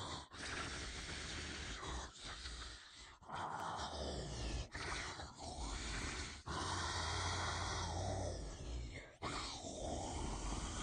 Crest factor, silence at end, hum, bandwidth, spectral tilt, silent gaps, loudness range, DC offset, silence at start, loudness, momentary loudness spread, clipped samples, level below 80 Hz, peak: 16 dB; 0 s; none; 10 kHz; -3.5 dB/octave; none; 4 LU; under 0.1%; 0 s; -45 LUFS; 9 LU; under 0.1%; -52 dBFS; -30 dBFS